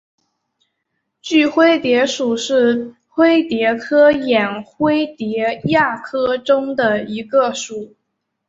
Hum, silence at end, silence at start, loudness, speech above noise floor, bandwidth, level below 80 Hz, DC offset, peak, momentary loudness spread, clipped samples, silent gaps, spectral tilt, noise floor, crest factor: none; 0.6 s; 1.25 s; -16 LUFS; 58 dB; 8 kHz; -58 dBFS; under 0.1%; -2 dBFS; 9 LU; under 0.1%; none; -4.5 dB/octave; -74 dBFS; 16 dB